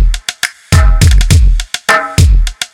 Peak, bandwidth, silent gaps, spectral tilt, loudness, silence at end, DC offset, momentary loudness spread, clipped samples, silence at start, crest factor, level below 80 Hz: 0 dBFS; 16.5 kHz; none; -4 dB/octave; -10 LUFS; 0.1 s; under 0.1%; 8 LU; 2%; 0 s; 8 dB; -10 dBFS